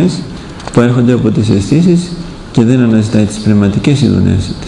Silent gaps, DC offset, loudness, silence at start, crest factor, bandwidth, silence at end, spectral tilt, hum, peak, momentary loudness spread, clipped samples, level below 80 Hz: none; under 0.1%; -10 LUFS; 0 s; 10 dB; 11 kHz; 0 s; -7 dB/octave; none; 0 dBFS; 11 LU; 0.9%; -34 dBFS